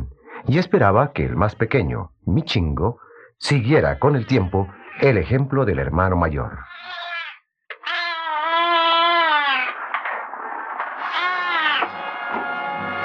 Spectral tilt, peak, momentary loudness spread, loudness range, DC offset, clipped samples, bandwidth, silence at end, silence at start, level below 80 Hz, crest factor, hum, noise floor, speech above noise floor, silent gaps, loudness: -6.5 dB/octave; -2 dBFS; 13 LU; 3 LU; under 0.1%; under 0.1%; 9.6 kHz; 0 s; 0 s; -40 dBFS; 18 dB; none; -42 dBFS; 23 dB; none; -20 LUFS